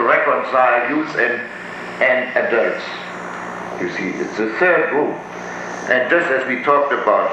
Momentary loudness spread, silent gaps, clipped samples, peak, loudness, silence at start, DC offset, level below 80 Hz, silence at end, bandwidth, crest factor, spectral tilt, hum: 13 LU; none; under 0.1%; -2 dBFS; -18 LUFS; 0 s; under 0.1%; -62 dBFS; 0 s; 9.2 kHz; 16 dB; -5 dB/octave; none